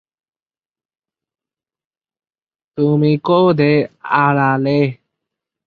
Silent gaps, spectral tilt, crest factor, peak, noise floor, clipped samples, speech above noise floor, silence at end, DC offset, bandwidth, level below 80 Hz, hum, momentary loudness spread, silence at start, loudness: none; -9.5 dB/octave; 16 dB; -2 dBFS; under -90 dBFS; under 0.1%; over 76 dB; 0.75 s; under 0.1%; 4.9 kHz; -60 dBFS; none; 6 LU; 2.75 s; -15 LUFS